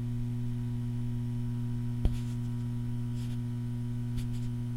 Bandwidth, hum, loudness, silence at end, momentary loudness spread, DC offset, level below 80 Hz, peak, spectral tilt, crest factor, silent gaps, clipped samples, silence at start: 12 kHz; none; -35 LUFS; 0 s; 2 LU; under 0.1%; -42 dBFS; -12 dBFS; -8 dB/octave; 20 dB; none; under 0.1%; 0 s